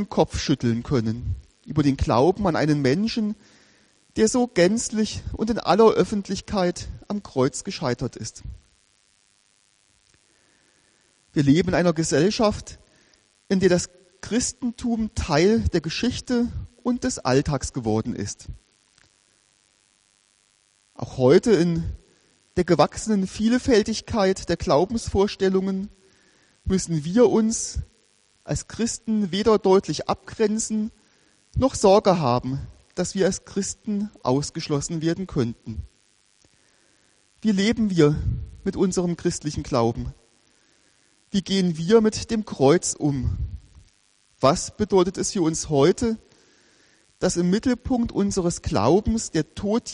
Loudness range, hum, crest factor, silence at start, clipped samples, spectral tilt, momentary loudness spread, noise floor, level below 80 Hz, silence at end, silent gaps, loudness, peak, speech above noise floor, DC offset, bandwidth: 6 LU; none; 20 dB; 0 s; under 0.1%; -5.5 dB/octave; 13 LU; -63 dBFS; -42 dBFS; 0 s; none; -23 LUFS; -4 dBFS; 41 dB; under 0.1%; 11 kHz